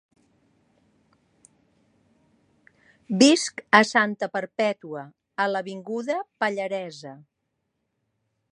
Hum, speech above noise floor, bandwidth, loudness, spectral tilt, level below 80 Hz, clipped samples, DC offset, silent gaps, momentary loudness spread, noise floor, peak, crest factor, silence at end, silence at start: none; 54 dB; 11 kHz; -23 LUFS; -3.5 dB/octave; -74 dBFS; under 0.1%; under 0.1%; none; 20 LU; -78 dBFS; 0 dBFS; 26 dB; 1.35 s; 3.1 s